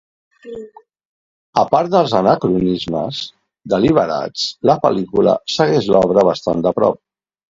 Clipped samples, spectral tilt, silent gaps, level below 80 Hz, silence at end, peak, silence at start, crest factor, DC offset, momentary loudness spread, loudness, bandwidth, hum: under 0.1%; -6 dB/octave; 1.05-1.53 s; -50 dBFS; 0.6 s; 0 dBFS; 0.45 s; 16 dB; under 0.1%; 13 LU; -16 LUFS; 7.8 kHz; none